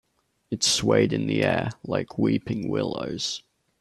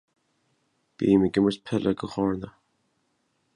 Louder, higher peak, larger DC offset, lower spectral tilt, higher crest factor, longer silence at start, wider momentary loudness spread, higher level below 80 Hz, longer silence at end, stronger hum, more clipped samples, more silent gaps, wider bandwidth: about the same, -25 LUFS vs -25 LUFS; about the same, -6 dBFS vs -8 dBFS; neither; second, -4 dB/octave vs -7.5 dB/octave; about the same, 20 dB vs 20 dB; second, 0.5 s vs 1 s; about the same, 9 LU vs 9 LU; about the same, -56 dBFS vs -56 dBFS; second, 0.4 s vs 1.05 s; neither; neither; neither; first, 13.5 kHz vs 10.5 kHz